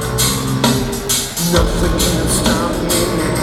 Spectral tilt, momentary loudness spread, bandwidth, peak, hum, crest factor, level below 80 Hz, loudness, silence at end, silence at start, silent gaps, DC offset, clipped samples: -4 dB/octave; 2 LU; 18 kHz; 0 dBFS; none; 16 dB; -24 dBFS; -15 LUFS; 0 s; 0 s; none; under 0.1%; under 0.1%